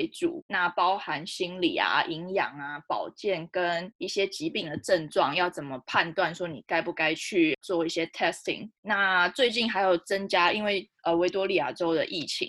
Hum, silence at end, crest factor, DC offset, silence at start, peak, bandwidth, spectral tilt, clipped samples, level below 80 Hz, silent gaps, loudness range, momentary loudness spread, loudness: none; 0 s; 20 dB; under 0.1%; 0 s; -8 dBFS; 12.5 kHz; -4 dB/octave; under 0.1%; -68 dBFS; 0.42-0.49 s, 3.95-3.99 s, 8.78-8.83 s; 4 LU; 8 LU; -27 LUFS